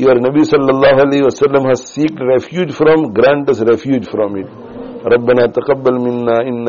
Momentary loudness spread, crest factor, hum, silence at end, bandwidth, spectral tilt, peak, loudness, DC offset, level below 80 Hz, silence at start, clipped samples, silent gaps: 9 LU; 12 dB; none; 0 s; 7.2 kHz; -5.5 dB/octave; 0 dBFS; -12 LUFS; under 0.1%; -48 dBFS; 0 s; under 0.1%; none